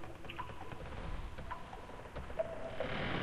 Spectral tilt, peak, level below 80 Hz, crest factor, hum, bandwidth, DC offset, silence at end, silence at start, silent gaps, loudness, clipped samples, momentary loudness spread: -6 dB/octave; -26 dBFS; -50 dBFS; 16 dB; none; 14.5 kHz; under 0.1%; 0 s; 0 s; none; -44 LUFS; under 0.1%; 8 LU